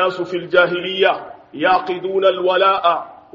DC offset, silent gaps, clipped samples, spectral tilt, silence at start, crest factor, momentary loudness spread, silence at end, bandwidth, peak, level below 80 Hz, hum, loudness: under 0.1%; none; under 0.1%; -1.5 dB/octave; 0 s; 16 dB; 10 LU; 0.2 s; 7.4 kHz; 0 dBFS; -62 dBFS; none; -17 LUFS